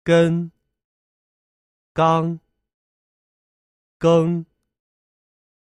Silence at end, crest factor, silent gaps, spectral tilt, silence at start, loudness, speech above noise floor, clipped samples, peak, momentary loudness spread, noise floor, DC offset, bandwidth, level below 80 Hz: 1.2 s; 20 dB; 0.84-1.95 s, 2.74-4.00 s; -7.5 dB/octave; 0.05 s; -19 LUFS; over 73 dB; under 0.1%; -4 dBFS; 14 LU; under -90 dBFS; under 0.1%; 10 kHz; -58 dBFS